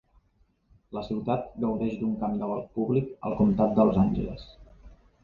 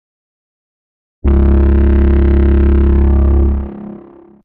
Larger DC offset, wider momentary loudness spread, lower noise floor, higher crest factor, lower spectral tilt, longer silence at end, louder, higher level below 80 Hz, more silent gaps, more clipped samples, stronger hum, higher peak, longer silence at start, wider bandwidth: neither; about the same, 12 LU vs 11 LU; first, -67 dBFS vs -37 dBFS; first, 18 dB vs 10 dB; second, -10.5 dB/octave vs -12.5 dB/octave; second, 0.3 s vs 0.5 s; second, -27 LUFS vs -12 LUFS; second, -48 dBFS vs -12 dBFS; neither; neither; neither; second, -10 dBFS vs -2 dBFS; second, 0.9 s vs 1.25 s; first, 4.9 kHz vs 3.2 kHz